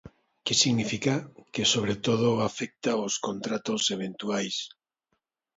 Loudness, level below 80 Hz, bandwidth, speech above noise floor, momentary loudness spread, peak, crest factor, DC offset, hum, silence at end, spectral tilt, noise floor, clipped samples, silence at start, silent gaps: -27 LUFS; -64 dBFS; 8 kHz; 51 dB; 9 LU; -8 dBFS; 20 dB; under 0.1%; none; 0.9 s; -3.5 dB/octave; -79 dBFS; under 0.1%; 0.05 s; none